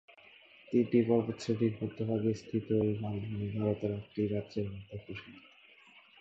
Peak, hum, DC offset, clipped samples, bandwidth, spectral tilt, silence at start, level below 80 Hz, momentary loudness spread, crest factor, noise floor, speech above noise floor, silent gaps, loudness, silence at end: -16 dBFS; none; under 0.1%; under 0.1%; 8 kHz; -8 dB/octave; 0.7 s; -62 dBFS; 16 LU; 18 dB; -60 dBFS; 27 dB; none; -33 LUFS; 0.8 s